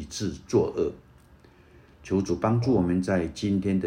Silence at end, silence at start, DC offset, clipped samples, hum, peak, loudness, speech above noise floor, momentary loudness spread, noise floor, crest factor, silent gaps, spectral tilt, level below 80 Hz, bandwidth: 0 s; 0 s; under 0.1%; under 0.1%; none; -10 dBFS; -26 LUFS; 29 dB; 7 LU; -54 dBFS; 16 dB; none; -7 dB/octave; -50 dBFS; 10.5 kHz